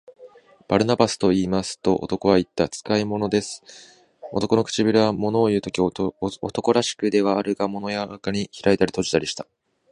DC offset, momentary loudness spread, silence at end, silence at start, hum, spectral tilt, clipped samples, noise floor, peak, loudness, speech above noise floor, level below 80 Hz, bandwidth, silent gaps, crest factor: under 0.1%; 8 LU; 0.5 s; 0.2 s; none; -5 dB/octave; under 0.1%; -48 dBFS; -2 dBFS; -22 LUFS; 27 dB; -52 dBFS; 11.5 kHz; none; 20 dB